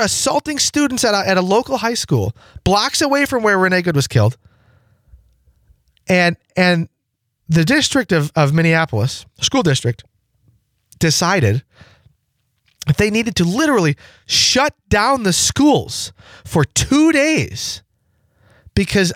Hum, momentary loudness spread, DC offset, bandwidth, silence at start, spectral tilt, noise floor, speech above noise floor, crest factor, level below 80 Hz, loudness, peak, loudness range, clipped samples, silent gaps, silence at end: none; 10 LU; under 0.1%; 16.5 kHz; 0 s; -4 dB/octave; -72 dBFS; 57 dB; 14 dB; -42 dBFS; -16 LUFS; -4 dBFS; 4 LU; under 0.1%; none; 0 s